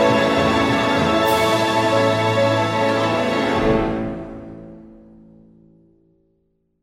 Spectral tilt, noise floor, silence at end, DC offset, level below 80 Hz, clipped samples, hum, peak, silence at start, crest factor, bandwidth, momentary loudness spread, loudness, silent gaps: -5.5 dB/octave; -66 dBFS; 1.9 s; under 0.1%; -42 dBFS; under 0.1%; none; -4 dBFS; 0 s; 16 dB; 16.5 kHz; 14 LU; -18 LUFS; none